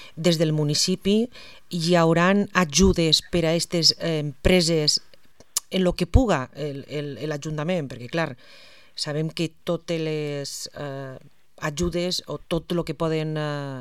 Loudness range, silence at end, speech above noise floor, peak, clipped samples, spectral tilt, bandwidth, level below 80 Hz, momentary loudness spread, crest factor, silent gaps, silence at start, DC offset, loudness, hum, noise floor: 9 LU; 0 s; 31 dB; -2 dBFS; under 0.1%; -4.5 dB/octave; 15.5 kHz; -38 dBFS; 13 LU; 22 dB; none; 0 s; 0.3%; -23 LUFS; none; -55 dBFS